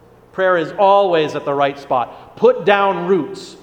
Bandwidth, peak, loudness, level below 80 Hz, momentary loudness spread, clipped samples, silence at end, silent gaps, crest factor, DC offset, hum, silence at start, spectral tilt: 9.6 kHz; 0 dBFS; -16 LUFS; -58 dBFS; 8 LU; under 0.1%; 0.05 s; none; 16 dB; under 0.1%; none; 0.35 s; -6 dB/octave